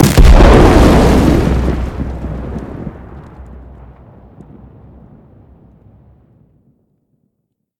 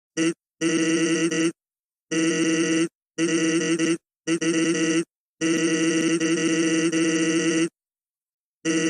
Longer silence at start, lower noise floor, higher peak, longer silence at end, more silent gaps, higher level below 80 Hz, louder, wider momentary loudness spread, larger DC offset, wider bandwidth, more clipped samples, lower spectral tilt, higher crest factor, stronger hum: second, 0 s vs 0.15 s; second, -70 dBFS vs under -90 dBFS; first, 0 dBFS vs -10 dBFS; first, 4.2 s vs 0 s; second, none vs 1.79-1.89 s, 2.00-2.07 s, 2.95-3.01 s, 5.15-5.36 s, 8.10-8.14 s, 8.22-8.61 s; first, -16 dBFS vs -74 dBFS; first, -10 LUFS vs -23 LUFS; first, 23 LU vs 6 LU; neither; first, 18 kHz vs 11 kHz; first, 2% vs under 0.1%; first, -6.5 dB/octave vs -3.5 dB/octave; about the same, 12 dB vs 14 dB; neither